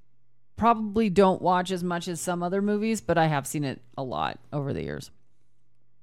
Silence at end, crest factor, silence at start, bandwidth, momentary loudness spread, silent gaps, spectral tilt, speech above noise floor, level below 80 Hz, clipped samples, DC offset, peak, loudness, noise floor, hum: 0.95 s; 20 dB; 0.55 s; 15.5 kHz; 12 LU; none; -5.5 dB/octave; 47 dB; -54 dBFS; under 0.1%; 0.1%; -8 dBFS; -26 LUFS; -73 dBFS; none